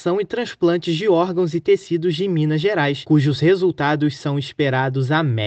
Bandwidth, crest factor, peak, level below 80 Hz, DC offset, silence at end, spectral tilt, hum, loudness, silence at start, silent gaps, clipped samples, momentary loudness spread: 8.4 kHz; 14 dB; -4 dBFS; -60 dBFS; under 0.1%; 0 s; -7 dB/octave; none; -19 LUFS; 0 s; none; under 0.1%; 5 LU